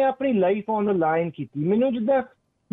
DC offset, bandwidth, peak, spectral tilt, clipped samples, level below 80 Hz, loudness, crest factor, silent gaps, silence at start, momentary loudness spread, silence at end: under 0.1%; 4 kHz; -12 dBFS; -10.5 dB/octave; under 0.1%; -64 dBFS; -23 LUFS; 12 dB; none; 0 s; 6 LU; 0.45 s